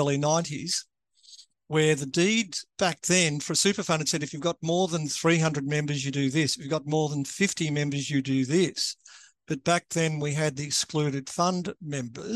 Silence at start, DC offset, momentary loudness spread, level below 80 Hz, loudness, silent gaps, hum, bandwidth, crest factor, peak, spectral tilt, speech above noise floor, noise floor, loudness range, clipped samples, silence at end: 0 s; under 0.1%; 7 LU; -68 dBFS; -26 LUFS; none; none; 12.5 kHz; 20 dB; -8 dBFS; -4 dB/octave; 27 dB; -54 dBFS; 2 LU; under 0.1%; 0 s